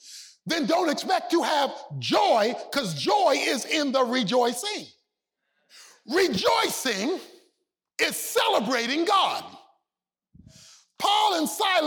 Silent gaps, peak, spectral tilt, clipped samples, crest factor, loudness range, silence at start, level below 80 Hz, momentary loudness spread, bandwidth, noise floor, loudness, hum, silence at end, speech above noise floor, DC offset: none; -10 dBFS; -3 dB/octave; under 0.1%; 16 dB; 3 LU; 0.05 s; -70 dBFS; 9 LU; over 20 kHz; under -90 dBFS; -24 LUFS; none; 0 s; over 66 dB; under 0.1%